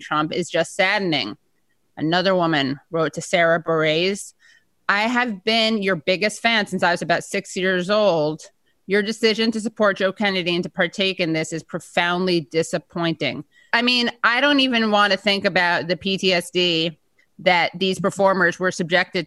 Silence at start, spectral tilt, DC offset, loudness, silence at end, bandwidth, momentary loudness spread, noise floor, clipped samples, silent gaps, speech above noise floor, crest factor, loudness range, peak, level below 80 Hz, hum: 0 s; -4 dB/octave; under 0.1%; -20 LUFS; 0 s; 12.5 kHz; 7 LU; -70 dBFS; under 0.1%; none; 50 dB; 18 dB; 3 LU; -2 dBFS; -64 dBFS; none